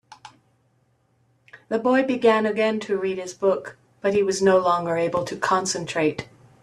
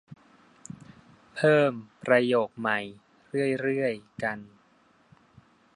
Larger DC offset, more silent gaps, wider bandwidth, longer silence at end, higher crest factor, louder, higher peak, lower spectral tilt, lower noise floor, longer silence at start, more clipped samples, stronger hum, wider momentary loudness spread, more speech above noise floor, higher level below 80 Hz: neither; neither; about the same, 12 kHz vs 11.5 kHz; second, 0.4 s vs 1.3 s; about the same, 18 dB vs 22 dB; first, -22 LUFS vs -26 LUFS; about the same, -6 dBFS vs -8 dBFS; second, -4.5 dB/octave vs -6 dB/octave; about the same, -65 dBFS vs -63 dBFS; first, 0.25 s vs 0.1 s; neither; neither; second, 9 LU vs 22 LU; first, 43 dB vs 37 dB; first, -64 dBFS vs -70 dBFS